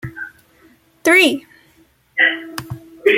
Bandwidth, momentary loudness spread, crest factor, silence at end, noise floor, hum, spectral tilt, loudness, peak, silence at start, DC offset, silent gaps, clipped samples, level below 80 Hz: 17 kHz; 21 LU; 18 dB; 0 s; -55 dBFS; none; -3.5 dB/octave; -15 LUFS; -2 dBFS; 0.05 s; under 0.1%; none; under 0.1%; -56 dBFS